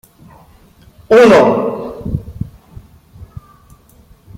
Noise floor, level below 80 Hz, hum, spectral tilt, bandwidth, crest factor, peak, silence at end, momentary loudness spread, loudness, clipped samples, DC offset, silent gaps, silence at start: -46 dBFS; -38 dBFS; none; -6.5 dB/octave; 15.5 kHz; 14 dB; 0 dBFS; 1.15 s; 22 LU; -11 LUFS; under 0.1%; under 0.1%; none; 1.1 s